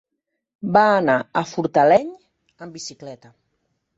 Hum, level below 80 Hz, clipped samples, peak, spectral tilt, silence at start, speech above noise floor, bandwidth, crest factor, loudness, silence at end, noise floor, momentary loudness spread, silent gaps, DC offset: none; -64 dBFS; under 0.1%; -4 dBFS; -5.5 dB/octave; 0.65 s; 59 dB; 8 kHz; 18 dB; -18 LUFS; 0.8 s; -78 dBFS; 22 LU; none; under 0.1%